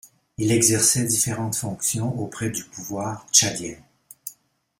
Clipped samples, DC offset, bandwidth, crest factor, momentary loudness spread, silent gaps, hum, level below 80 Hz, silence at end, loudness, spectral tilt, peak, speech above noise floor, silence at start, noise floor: under 0.1%; under 0.1%; 16.5 kHz; 22 dB; 20 LU; none; none; -56 dBFS; 0.45 s; -21 LUFS; -3 dB/octave; -2 dBFS; 33 dB; 0.05 s; -56 dBFS